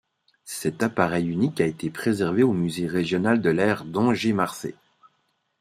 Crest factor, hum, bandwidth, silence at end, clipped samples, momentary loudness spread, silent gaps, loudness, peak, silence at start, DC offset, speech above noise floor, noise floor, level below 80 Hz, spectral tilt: 20 dB; none; 15.5 kHz; 0.85 s; under 0.1%; 8 LU; none; -24 LUFS; -4 dBFS; 0.45 s; under 0.1%; 48 dB; -71 dBFS; -60 dBFS; -6 dB/octave